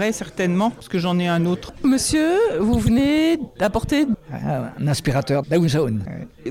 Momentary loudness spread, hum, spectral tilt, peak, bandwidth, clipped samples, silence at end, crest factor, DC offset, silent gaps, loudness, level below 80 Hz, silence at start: 8 LU; none; -5.5 dB/octave; -6 dBFS; 16.5 kHz; under 0.1%; 0 s; 14 dB; under 0.1%; none; -20 LUFS; -40 dBFS; 0 s